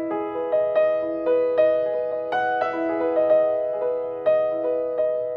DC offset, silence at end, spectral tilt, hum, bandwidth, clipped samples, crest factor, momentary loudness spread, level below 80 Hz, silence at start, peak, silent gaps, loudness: under 0.1%; 0 s; -7 dB/octave; none; 5 kHz; under 0.1%; 14 dB; 6 LU; -64 dBFS; 0 s; -8 dBFS; none; -22 LUFS